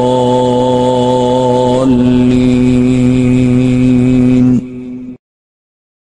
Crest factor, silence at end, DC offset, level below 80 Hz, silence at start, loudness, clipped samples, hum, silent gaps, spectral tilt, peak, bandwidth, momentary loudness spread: 10 dB; 0.85 s; under 0.1%; -32 dBFS; 0 s; -10 LUFS; under 0.1%; none; none; -7.5 dB/octave; 0 dBFS; 10 kHz; 6 LU